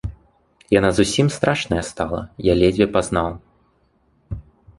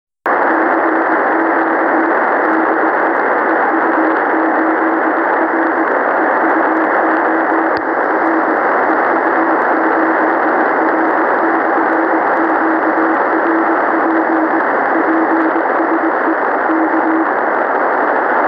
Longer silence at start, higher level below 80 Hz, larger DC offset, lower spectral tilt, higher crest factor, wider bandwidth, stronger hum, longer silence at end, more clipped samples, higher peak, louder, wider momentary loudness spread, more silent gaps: second, 0.05 s vs 0.25 s; first, -38 dBFS vs -66 dBFS; neither; second, -5.5 dB/octave vs -7.5 dB/octave; first, 20 dB vs 10 dB; first, 11.5 kHz vs 5.4 kHz; neither; first, 0.35 s vs 0 s; neither; about the same, -2 dBFS vs -2 dBFS; second, -19 LUFS vs -13 LUFS; first, 19 LU vs 1 LU; neither